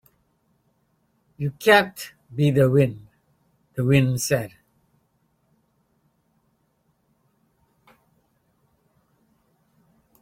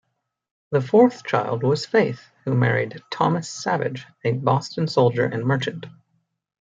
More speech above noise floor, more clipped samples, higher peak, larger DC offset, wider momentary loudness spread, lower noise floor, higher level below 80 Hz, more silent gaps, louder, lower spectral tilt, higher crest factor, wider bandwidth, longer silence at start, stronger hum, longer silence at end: about the same, 49 dB vs 49 dB; neither; about the same, -2 dBFS vs -4 dBFS; neither; first, 19 LU vs 9 LU; about the same, -68 dBFS vs -71 dBFS; first, -58 dBFS vs -66 dBFS; neither; about the same, -21 LUFS vs -22 LUFS; about the same, -5.5 dB/octave vs -6.5 dB/octave; first, 24 dB vs 18 dB; first, 16.5 kHz vs 7.8 kHz; first, 1.4 s vs 0.7 s; neither; first, 5.75 s vs 0.75 s